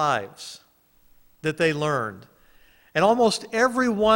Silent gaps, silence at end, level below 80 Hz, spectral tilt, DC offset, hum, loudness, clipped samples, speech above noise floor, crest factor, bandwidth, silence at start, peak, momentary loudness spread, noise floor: none; 0 s; -58 dBFS; -4.5 dB/octave; under 0.1%; none; -23 LUFS; under 0.1%; 37 dB; 18 dB; 16.5 kHz; 0 s; -6 dBFS; 15 LU; -59 dBFS